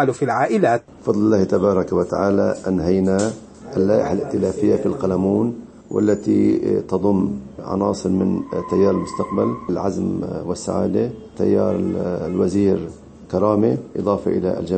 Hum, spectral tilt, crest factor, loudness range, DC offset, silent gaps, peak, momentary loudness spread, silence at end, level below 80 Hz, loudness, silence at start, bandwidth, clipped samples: none; -7.5 dB/octave; 16 dB; 3 LU; under 0.1%; none; -2 dBFS; 8 LU; 0 s; -48 dBFS; -20 LUFS; 0 s; 8.8 kHz; under 0.1%